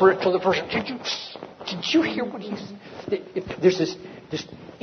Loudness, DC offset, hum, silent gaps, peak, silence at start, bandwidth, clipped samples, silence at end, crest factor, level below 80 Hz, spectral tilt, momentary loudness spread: -25 LUFS; under 0.1%; none; none; -4 dBFS; 0 s; 6.6 kHz; under 0.1%; 0.05 s; 20 dB; -60 dBFS; -5 dB/octave; 16 LU